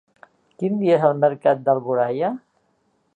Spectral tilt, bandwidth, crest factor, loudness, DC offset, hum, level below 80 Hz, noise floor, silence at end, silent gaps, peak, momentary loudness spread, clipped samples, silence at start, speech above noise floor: -9 dB/octave; 8.6 kHz; 18 dB; -20 LUFS; under 0.1%; none; -74 dBFS; -66 dBFS; 0.8 s; none; -4 dBFS; 9 LU; under 0.1%; 0.6 s; 47 dB